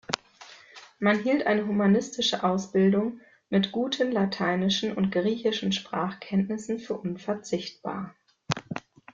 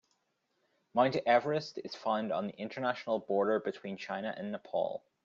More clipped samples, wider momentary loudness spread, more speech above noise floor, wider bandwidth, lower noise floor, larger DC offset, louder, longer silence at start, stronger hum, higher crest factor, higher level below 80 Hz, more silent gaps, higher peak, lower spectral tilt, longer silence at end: neither; about the same, 11 LU vs 11 LU; second, 25 dB vs 46 dB; about the same, 7.6 kHz vs 7.4 kHz; second, -51 dBFS vs -79 dBFS; neither; first, -27 LUFS vs -34 LUFS; second, 0.1 s vs 0.95 s; neither; first, 26 dB vs 20 dB; first, -66 dBFS vs -80 dBFS; neither; first, 0 dBFS vs -14 dBFS; about the same, -5.5 dB/octave vs -6 dB/octave; about the same, 0.35 s vs 0.25 s